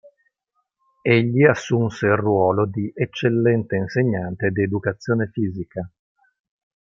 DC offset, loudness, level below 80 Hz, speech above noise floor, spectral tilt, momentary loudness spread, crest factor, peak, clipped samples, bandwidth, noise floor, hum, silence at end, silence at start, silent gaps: under 0.1%; -20 LUFS; -58 dBFS; 54 dB; -7.5 dB/octave; 9 LU; 20 dB; -2 dBFS; under 0.1%; 7.6 kHz; -74 dBFS; none; 0.95 s; 1.05 s; none